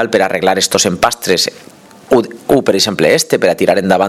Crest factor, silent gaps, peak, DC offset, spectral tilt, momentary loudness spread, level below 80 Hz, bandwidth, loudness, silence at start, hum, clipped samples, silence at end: 12 dB; none; 0 dBFS; under 0.1%; -3.5 dB/octave; 3 LU; -48 dBFS; 16.5 kHz; -12 LUFS; 0 s; none; 0.2%; 0 s